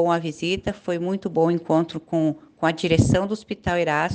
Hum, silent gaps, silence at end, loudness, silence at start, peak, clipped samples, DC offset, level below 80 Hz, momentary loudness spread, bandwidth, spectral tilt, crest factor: none; none; 0 s; -23 LUFS; 0 s; -4 dBFS; under 0.1%; under 0.1%; -44 dBFS; 7 LU; 9.8 kHz; -6 dB/octave; 18 dB